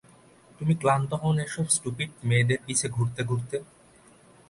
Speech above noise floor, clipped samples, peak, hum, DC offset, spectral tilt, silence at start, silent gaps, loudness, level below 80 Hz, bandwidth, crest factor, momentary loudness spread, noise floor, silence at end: 30 dB; under 0.1%; -8 dBFS; none; under 0.1%; -4.5 dB/octave; 0.6 s; none; -27 LUFS; -58 dBFS; 11.5 kHz; 20 dB; 8 LU; -56 dBFS; 0.85 s